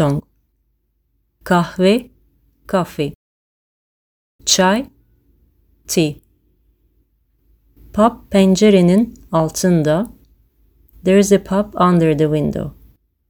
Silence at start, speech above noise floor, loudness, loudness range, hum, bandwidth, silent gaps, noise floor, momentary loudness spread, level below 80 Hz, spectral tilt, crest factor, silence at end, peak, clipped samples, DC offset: 0 s; 51 dB; -16 LUFS; 6 LU; none; over 20 kHz; 3.15-4.39 s; -65 dBFS; 13 LU; -46 dBFS; -5.5 dB/octave; 18 dB; 0.6 s; 0 dBFS; under 0.1%; under 0.1%